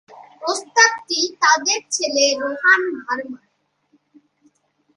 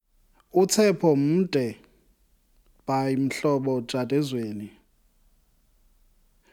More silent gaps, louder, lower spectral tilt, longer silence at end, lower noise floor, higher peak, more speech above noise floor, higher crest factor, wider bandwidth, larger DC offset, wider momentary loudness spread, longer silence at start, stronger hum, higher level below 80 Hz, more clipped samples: neither; first, -17 LUFS vs -24 LUFS; second, 1 dB/octave vs -5.5 dB/octave; second, 1.6 s vs 1.85 s; about the same, -63 dBFS vs -63 dBFS; first, 0 dBFS vs -8 dBFS; first, 44 dB vs 40 dB; about the same, 20 dB vs 18 dB; second, 11.5 kHz vs 18 kHz; neither; second, 12 LU vs 15 LU; second, 0.1 s vs 0.55 s; neither; second, -74 dBFS vs -62 dBFS; neither